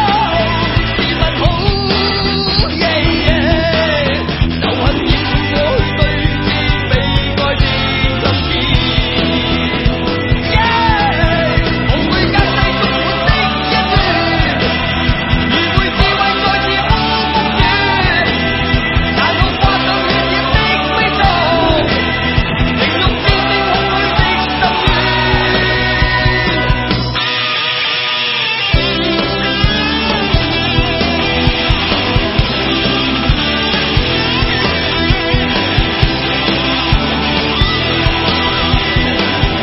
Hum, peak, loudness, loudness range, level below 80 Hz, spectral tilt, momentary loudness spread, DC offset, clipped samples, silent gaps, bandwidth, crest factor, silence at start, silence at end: none; 0 dBFS; -12 LUFS; 1 LU; -22 dBFS; -7.5 dB/octave; 2 LU; under 0.1%; under 0.1%; none; 6 kHz; 12 dB; 0 s; 0 s